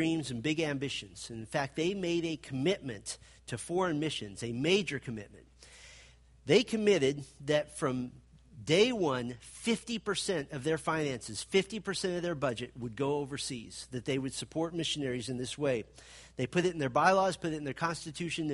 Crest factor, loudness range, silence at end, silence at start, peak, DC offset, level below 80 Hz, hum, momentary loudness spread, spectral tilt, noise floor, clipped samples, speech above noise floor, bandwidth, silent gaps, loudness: 22 dB; 4 LU; 0 s; 0 s; -12 dBFS; under 0.1%; -62 dBFS; none; 15 LU; -4.5 dB/octave; -58 dBFS; under 0.1%; 25 dB; 11.5 kHz; none; -33 LUFS